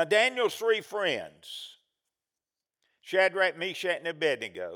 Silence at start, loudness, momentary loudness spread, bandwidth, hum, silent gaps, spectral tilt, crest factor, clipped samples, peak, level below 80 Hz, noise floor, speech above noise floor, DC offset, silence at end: 0 s; -28 LUFS; 17 LU; over 20 kHz; none; none; -2.5 dB/octave; 20 dB; under 0.1%; -10 dBFS; -84 dBFS; under -90 dBFS; over 62 dB; under 0.1%; 0 s